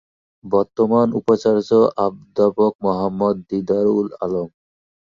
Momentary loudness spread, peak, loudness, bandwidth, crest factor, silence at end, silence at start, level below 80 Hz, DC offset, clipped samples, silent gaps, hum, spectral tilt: 8 LU; -4 dBFS; -19 LUFS; 7.4 kHz; 16 dB; 0.65 s; 0.45 s; -56 dBFS; under 0.1%; under 0.1%; 2.75-2.79 s; none; -8 dB/octave